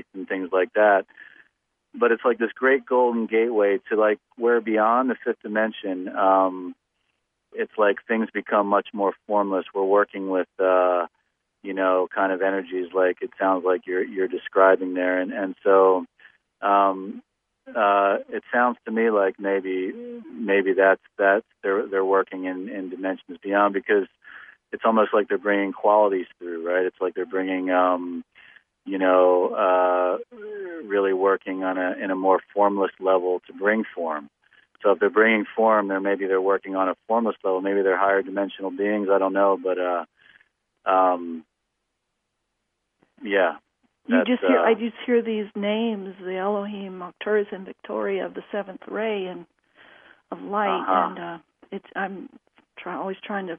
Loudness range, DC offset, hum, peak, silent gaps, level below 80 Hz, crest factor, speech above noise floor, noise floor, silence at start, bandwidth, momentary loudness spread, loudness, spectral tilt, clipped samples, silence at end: 6 LU; under 0.1%; none; -4 dBFS; none; -76 dBFS; 20 dB; 56 dB; -78 dBFS; 0.15 s; 3.6 kHz; 14 LU; -23 LUFS; -9 dB/octave; under 0.1%; 0 s